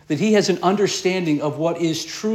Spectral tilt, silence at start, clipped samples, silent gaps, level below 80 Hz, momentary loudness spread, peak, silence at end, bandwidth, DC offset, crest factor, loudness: -5 dB/octave; 0.1 s; under 0.1%; none; -64 dBFS; 6 LU; -6 dBFS; 0 s; 15.5 kHz; under 0.1%; 14 dB; -20 LUFS